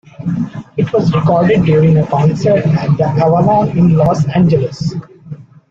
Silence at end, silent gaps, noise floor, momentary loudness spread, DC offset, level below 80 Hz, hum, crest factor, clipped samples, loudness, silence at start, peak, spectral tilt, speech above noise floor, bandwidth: 0.3 s; none; -32 dBFS; 11 LU; under 0.1%; -42 dBFS; none; 10 dB; under 0.1%; -12 LUFS; 0.2 s; 0 dBFS; -9 dB/octave; 21 dB; 7.4 kHz